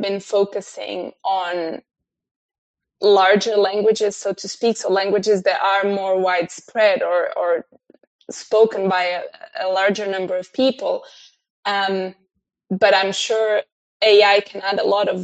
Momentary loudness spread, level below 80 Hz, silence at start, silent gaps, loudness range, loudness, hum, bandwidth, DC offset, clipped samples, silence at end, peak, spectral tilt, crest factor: 13 LU; -72 dBFS; 0 s; 2.31-2.49 s, 2.58-2.74 s, 8.07-8.19 s, 11.50-11.63 s, 13.72-14.00 s; 4 LU; -19 LUFS; none; 8.8 kHz; under 0.1%; under 0.1%; 0 s; -2 dBFS; -3.5 dB/octave; 18 dB